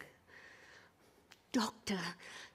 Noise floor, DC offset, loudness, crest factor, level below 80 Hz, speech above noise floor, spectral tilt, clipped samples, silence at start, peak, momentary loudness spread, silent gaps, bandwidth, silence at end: -67 dBFS; under 0.1%; -40 LUFS; 22 dB; -76 dBFS; 27 dB; -3.5 dB/octave; under 0.1%; 0 s; -22 dBFS; 21 LU; none; 15.5 kHz; 0.05 s